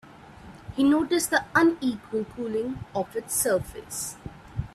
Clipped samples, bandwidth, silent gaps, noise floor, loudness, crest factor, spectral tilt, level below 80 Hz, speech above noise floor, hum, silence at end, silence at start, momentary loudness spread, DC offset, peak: under 0.1%; 15.5 kHz; none; -47 dBFS; -26 LUFS; 20 dB; -4 dB/octave; -50 dBFS; 21 dB; none; 0.1 s; 0.05 s; 15 LU; under 0.1%; -8 dBFS